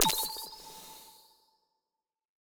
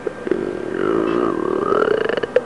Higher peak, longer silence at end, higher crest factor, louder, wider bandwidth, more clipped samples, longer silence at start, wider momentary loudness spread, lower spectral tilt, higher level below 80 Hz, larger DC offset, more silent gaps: second, -8 dBFS vs -2 dBFS; first, 1.3 s vs 0 s; first, 30 dB vs 16 dB; second, -33 LUFS vs -20 LUFS; first, over 20 kHz vs 11 kHz; neither; about the same, 0 s vs 0 s; first, 21 LU vs 6 LU; second, -0.5 dB/octave vs -6.5 dB/octave; second, -62 dBFS vs -52 dBFS; second, under 0.1% vs 0.4%; neither